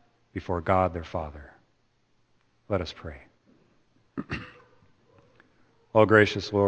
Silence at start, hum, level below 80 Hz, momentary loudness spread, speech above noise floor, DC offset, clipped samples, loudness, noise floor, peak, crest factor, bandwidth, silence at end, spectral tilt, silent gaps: 0.35 s; none; -52 dBFS; 22 LU; 43 dB; under 0.1%; under 0.1%; -26 LUFS; -68 dBFS; -4 dBFS; 24 dB; 8.6 kHz; 0 s; -6.5 dB/octave; none